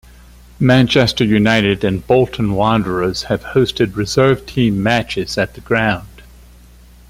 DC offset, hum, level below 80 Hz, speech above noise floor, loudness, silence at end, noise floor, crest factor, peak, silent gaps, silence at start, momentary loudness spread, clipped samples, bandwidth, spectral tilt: under 0.1%; 60 Hz at -35 dBFS; -38 dBFS; 28 dB; -15 LUFS; 0.9 s; -42 dBFS; 16 dB; 0 dBFS; none; 0.6 s; 6 LU; under 0.1%; 15.5 kHz; -6 dB/octave